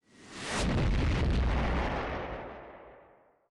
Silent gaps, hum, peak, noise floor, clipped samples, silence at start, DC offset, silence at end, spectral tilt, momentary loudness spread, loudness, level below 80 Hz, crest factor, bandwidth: none; none; -22 dBFS; -61 dBFS; under 0.1%; 0.2 s; under 0.1%; 0.5 s; -5.5 dB/octave; 18 LU; -32 LUFS; -34 dBFS; 10 dB; 11.5 kHz